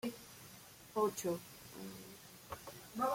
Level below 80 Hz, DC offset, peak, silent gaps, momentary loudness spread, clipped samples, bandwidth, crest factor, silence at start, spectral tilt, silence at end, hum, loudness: -72 dBFS; under 0.1%; -24 dBFS; none; 17 LU; under 0.1%; 16.5 kHz; 18 dB; 0.05 s; -4.5 dB/octave; 0 s; none; -43 LUFS